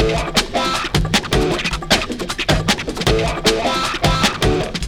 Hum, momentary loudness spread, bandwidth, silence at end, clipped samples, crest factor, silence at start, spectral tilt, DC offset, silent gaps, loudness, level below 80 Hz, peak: none; 3 LU; over 20 kHz; 0 s; under 0.1%; 18 dB; 0 s; -4 dB/octave; under 0.1%; none; -17 LUFS; -28 dBFS; 0 dBFS